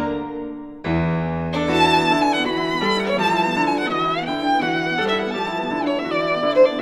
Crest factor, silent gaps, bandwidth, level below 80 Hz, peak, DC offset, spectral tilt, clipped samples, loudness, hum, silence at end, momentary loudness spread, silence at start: 16 dB; none; 13 kHz; -46 dBFS; -4 dBFS; under 0.1%; -5.5 dB/octave; under 0.1%; -20 LUFS; none; 0 s; 8 LU; 0 s